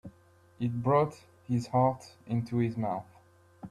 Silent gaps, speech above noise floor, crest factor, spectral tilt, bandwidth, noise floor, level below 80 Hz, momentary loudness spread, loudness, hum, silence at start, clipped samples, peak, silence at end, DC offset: none; 31 dB; 18 dB; -8.5 dB/octave; 11.5 kHz; -61 dBFS; -64 dBFS; 13 LU; -31 LUFS; none; 0.05 s; under 0.1%; -14 dBFS; 0 s; under 0.1%